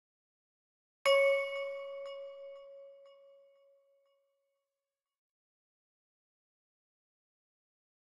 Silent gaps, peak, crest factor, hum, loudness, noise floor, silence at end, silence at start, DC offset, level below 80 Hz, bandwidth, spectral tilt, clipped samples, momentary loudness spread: none; -18 dBFS; 22 dB; none; -32 LUFS; under -90 dBFS; 5.05 s; 1.05 s; under 0.1%; -88 dBFS; 11.5 kHz; 1.5 dB/octave; under 0.1%; 24 LU